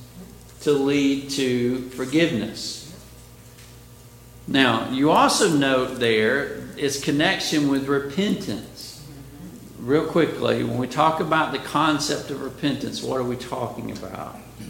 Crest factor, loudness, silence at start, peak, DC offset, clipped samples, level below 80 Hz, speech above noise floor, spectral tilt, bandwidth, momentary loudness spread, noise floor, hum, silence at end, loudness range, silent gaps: 22 dB; -22 LUFS; 0 s; -2 dBFS; under 0.1%; under 0.1%; -52 dBFS; 23 dB; -4.5 dB/octave; 17 kHz; 18 LU; -45 dBFS; 60 Hz at -50 dBFS; 0 s; 5 LU; none